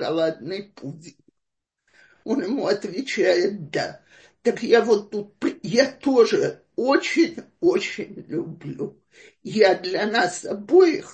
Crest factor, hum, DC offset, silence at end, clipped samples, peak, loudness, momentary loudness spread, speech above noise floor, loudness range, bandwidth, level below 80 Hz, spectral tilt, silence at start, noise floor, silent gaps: 20 dB; none; under 0.1%; 0 s; under 0.1%; -4 dBFS; -22 LUFS; 15 LU; 59 dB; 5 LU; 8.8 kHz; -70 dBFS; -4.5 dB/octave; 0 s; -81 dBFS; none